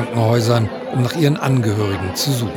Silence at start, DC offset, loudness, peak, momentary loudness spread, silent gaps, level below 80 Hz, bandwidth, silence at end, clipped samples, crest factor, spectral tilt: 0 s; under 0.1%; -18 LUFS; 0 dBFS; 5 LU; none; -54 dBFS; 18.5 kHz; 0 s; under 0.1%; 16 dB; -6 dB/octave